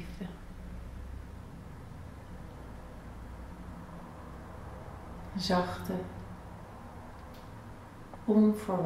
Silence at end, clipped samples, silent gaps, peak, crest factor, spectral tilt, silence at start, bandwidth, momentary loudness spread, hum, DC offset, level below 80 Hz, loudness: 0 s; under 0.1%; none; -16 dBFS; 20 dB; -6.5 dB/octave; 0 s; 15 kHz; 19 LU; none; under 0.1%; -50 dBFS; -35 LUFS